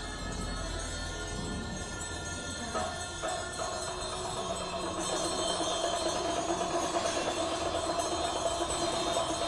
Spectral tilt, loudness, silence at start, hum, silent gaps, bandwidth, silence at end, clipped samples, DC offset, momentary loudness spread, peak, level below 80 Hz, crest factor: -3 dB/octave; -33 LUFS; 0 s; none; none; 11.5 kHz; 0 s; under 0.1%; under 0.1%; 6 LU; -16 dBFS; -48 dBFS; 18 dB